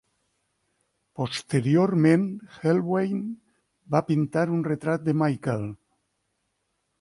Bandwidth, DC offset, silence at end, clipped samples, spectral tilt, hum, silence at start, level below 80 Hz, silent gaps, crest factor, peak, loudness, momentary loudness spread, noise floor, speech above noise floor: 11.5 kHz; under 0.1%; 1.25 s; under 0.1%; -7.5 dB/octave; none; 1.2 s; -64 dBFS; none; 18 dB; -8 dBFS; -25 LUFS; 12 LU; -76 dBFS; 52 dB